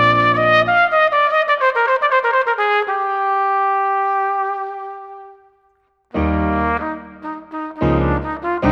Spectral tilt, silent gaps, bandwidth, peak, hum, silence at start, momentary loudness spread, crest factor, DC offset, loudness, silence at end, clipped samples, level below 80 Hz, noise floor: -7 dB/octave; none; 8 kHz; -2 dBFS; none; 0 s; 15 LU; 16 dB; under 0.1%; -17 LUFS; 0 s; under 0.1%; -34 dBFS; -61 dBFS